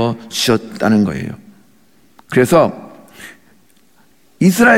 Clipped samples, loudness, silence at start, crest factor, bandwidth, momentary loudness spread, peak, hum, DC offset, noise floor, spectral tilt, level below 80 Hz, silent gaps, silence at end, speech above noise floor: under 0.1%; -15 LUFS; 0 s; 16 dB; 17 kHz; 24 LU; -2 dBFS; none; 0.3%; -54 dBFS; -5 dB/octave; -50 dBFS; none; 0 s; 41 dB